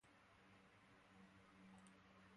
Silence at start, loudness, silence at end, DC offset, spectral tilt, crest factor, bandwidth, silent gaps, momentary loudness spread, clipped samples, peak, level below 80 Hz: 0 s; -68 LUFS; 0 s; under 0.1%; -5 dB/octave; 18 dB; 11 kHz; none; 4 LU; under 0.1%; -50 dBFS; -86 dBFS